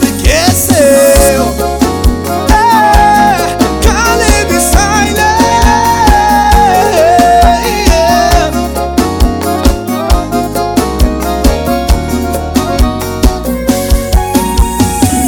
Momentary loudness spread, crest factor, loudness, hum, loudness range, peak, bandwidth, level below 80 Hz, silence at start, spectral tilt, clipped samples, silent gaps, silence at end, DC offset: 7 LU; 8 dB; -9 LUFS; none; 5 LU; 0 dBFS; 19.5 kHz; -14 dBFS; 0 s; -4.5 dB/octave; 0.3%; none; 0 s; under 0.1%